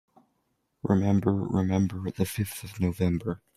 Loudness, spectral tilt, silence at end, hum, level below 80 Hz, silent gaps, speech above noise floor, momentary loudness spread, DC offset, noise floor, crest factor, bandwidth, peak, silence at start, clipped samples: -28 LUFS; -7.5 dB/octave; 0.2 s; none; -54 dBFS; none; 49 dB; 8 LU; under 0.1%; -75 dBFS; 18 dB; 15.5 kHz; -10 dBFS; 0.85 s; under 0.1%